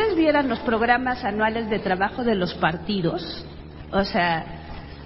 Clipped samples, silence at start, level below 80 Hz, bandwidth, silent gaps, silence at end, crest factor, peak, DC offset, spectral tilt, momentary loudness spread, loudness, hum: under 0.1%; 0 s; -44 dBFS; 5.8 kHz; none; 0 s; 20 dB; -4 dBFS; under 0.1%; -10 dB/octave; 16 LU; -23 LUFS; none